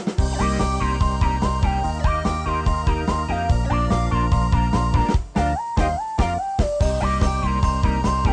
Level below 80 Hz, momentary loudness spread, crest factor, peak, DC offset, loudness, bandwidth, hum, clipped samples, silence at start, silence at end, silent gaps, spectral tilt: -24 dBFS; 3 LU; 10 dB; -8 dBFS; under 0.1%; -21 LUFS; 10 kHz; none; under 0.1%; 0 s; 0 s; none; -6.5 dB/octave